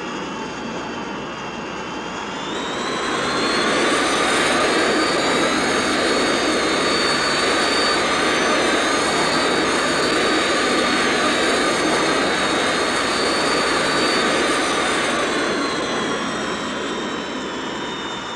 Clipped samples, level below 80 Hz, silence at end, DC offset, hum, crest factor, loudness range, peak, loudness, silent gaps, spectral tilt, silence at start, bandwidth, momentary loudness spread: under 0.1%; -48 dBFS; 0 s; under 0.1%; none; 14 dB; 5 LU; -6 dBFS; -19 LUFS; none; -2.5 dB/octave; 0 s; 14 kHz; 10 LU